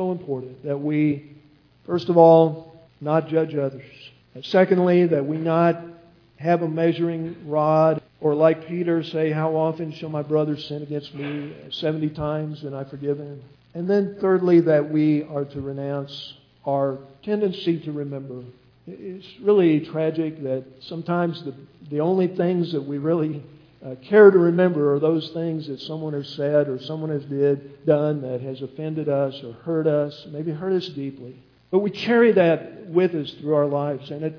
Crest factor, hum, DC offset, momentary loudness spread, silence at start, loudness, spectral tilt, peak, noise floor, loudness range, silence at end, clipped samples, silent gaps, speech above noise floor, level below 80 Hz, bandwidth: 20 dB; none; under 0.1%; 16 LU; 0 s; -22 LUFS; -9 dB/octave; -2 dBFS; -54 dBFS; 7 LU; 0 s; under 0.1%; none; 33 dB; -64 dBFS; 5.4 kHz